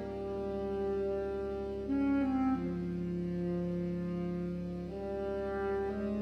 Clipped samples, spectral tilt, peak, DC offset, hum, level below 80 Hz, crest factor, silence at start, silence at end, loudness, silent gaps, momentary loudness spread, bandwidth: under 0.1%; -9.5 dB/octave; -22 dBFS; under 0.1%; none; -52 dBFS; 12 dB; 0 s; 0 s; -35 LUFS; none; 7 LU; 6.4 kHz